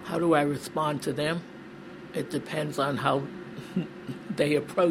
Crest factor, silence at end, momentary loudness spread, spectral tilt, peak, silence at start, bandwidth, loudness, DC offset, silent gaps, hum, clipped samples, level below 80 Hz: 20 dB; 0 s; 16 LU; -6 dB/octave; -8 dBFS; 0 s; 16 kHz; -29 LUFS; under 0.1%; none; none; under 0.1%; -64 dBFS